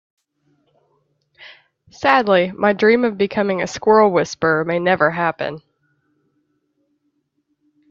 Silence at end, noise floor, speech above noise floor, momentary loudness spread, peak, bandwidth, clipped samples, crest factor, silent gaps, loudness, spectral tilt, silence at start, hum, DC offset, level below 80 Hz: 2.35 s; -69 dBFS; 53 dB; 7 LU; 0 dBFS; 7.6 kHz; under 0.1%; 18 dB; none; -17 LUFS; -5.5 dB/octave; 1.4 s; none; under 0.1%; -60 dBFS